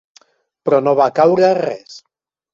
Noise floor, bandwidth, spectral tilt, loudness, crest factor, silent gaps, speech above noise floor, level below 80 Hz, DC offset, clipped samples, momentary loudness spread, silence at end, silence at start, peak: -53 dBFS; 7.4 kHz; -6.5 dB/octave; -15 LUFS; 14 dB; none; 39 dB; -64 dBFS; under 0.1%; under 0.1%; 13 LU; 0.55 s; 0.65 s; -2 dBFS